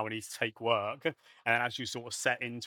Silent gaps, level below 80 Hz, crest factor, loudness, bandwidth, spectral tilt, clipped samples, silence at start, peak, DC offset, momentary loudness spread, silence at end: none; -84 dBFS; 22 dB; -33 LUFS; 19 kHz; -3 dB/octave; under 0.1%; 0 s; -12 dBFS; under 0.1%; 7 LU; 0 s